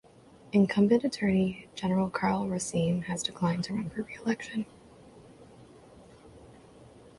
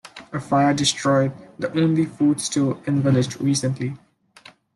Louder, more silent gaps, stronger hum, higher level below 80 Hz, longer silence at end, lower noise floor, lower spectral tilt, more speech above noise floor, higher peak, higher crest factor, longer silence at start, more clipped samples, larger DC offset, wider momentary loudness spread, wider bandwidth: second, -29 LUFS vs -21 LUFS; neither; neither; about the same, -60 dBFS vs -60 dBFS; second, 0.35 s vs 0.8 s; first, -55 dBFS vs -50 dBFS; about the same, -6 dB/octave vs -5 dB/octave; about the same, 27 dB vs 29 dB; second, -12 dBFS vs -6 dBFS; about the same, 18 dB vs 16 dB; first, 0.55 s vs 0.05 s; neither; neither; about the same, 10 LU vs 12 LU; about the same, 11.5 kHz vs 12 kHz